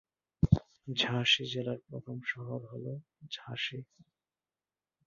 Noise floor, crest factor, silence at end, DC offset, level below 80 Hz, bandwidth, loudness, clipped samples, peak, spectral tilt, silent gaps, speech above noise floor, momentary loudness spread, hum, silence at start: under -90 dBFS; 26 dB; 1.2 s; under 0.1%; -50 dBFS; 7.2 kHz; -33 LUFS; under 0.1%; -8 dBFS; -3.5 dB/octave; none; over 54 dB; 16 LU; none; 0.4 s